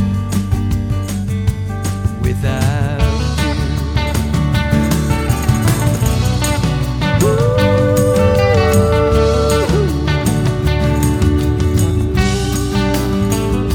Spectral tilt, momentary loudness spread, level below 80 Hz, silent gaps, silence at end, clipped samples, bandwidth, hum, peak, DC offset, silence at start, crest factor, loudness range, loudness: -6 dB/octave; 6 LU; -22 dBFS; none; 0 s; under 0.1%; 18.5 kHz; none; 0 dBFS; under 0.1%; 0 s; 14 dB; 4 LU; -15 LUFS